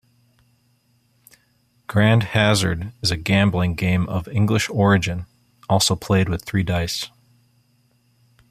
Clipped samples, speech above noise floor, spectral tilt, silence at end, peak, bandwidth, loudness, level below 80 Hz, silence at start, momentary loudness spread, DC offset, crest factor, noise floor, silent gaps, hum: under 0.1%; 43 dB; -5 dB/octave; 1.45 s; -2 dBFS; 15 kHz; -20 LUFS; -46 dBFS; 1.9 s; 9 LU; under 0.1%; 18 dB; -62 dBFS; none; none